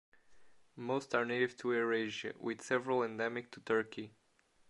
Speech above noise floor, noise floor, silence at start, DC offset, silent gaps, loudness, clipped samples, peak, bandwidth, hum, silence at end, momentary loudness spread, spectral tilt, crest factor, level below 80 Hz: 28 dB; -64 dBFS; 0.3 s; under 0.1%; none; -36 LUFS; under 0.1%; -16 dBFS; 11.5 kHz; none; 0.6 s; 11 LU; -5 dB/octave; 22 dB; -82 dBFS